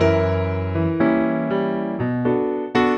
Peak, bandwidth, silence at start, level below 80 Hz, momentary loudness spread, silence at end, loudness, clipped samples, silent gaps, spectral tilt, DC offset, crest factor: -4 dBFS; 8.6 kHz; 0 s; -46 dBFS; 5 LU; 0 s; -21 LUFS; under 0.1%; none; -8.5 dB/octave; under 0.1%; 16 dB